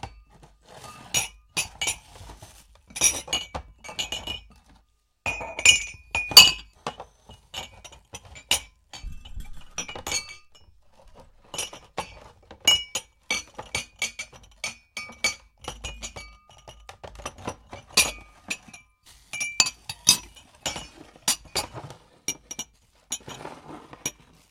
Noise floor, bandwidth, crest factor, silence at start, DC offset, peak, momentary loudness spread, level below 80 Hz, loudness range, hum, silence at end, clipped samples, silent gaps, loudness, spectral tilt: -64 dBFS; 16 kHz; 28 dB; 0.05 s; under 0.1%; 0 dBFS; 23 LU; -50 dBFS; 15 LU; none; 0.4 s; under 0.1%; none; -23 LUFS; 0.5 dB/octave